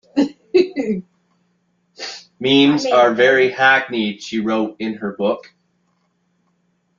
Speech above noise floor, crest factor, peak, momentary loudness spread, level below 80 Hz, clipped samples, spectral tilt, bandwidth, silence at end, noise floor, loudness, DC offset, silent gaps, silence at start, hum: 49 dB; 18 dB; -2 dBFS; 14 LU; -64 dBFS; under 0.1%; -5 dB/octave; 7.6 kHz; 1.6 s; -65 dBFS; -17 LUFS; under 0.1%; none; 0.15 s; none